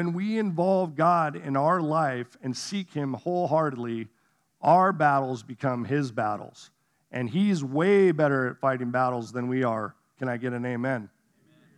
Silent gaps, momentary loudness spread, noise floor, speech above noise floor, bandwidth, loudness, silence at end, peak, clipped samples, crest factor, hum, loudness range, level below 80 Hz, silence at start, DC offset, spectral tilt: none; 13 LU; -64 dBFS; 38 dB; 11.5 kHz; -26 LUFS; 0.7 s; -8 dBFS; under 0.1%; 18 dB; none; 3 LU; -84 dBFS; 0 s; under 0.1%; -7 dB/octave